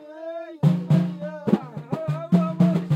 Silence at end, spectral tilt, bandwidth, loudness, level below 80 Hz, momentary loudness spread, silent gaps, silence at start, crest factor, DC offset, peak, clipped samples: 0 s; -9.5 dB/octave; 7.4 kHz; -23 LUFS; -66 dBFS; 13 LU; none; 0 s; 18 dB; under 0.1%; -4 dBFS; under 0.1%